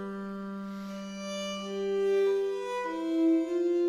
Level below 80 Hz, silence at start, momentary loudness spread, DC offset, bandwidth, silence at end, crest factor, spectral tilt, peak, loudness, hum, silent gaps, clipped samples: -68 dBFS; 0 s; 12 LU; under 0.1%; 11.5 kHz; 0 s; 12 dB; -5.5 dB/octave; -18 dBFS; -31 LUFS; none; none; under 0.1%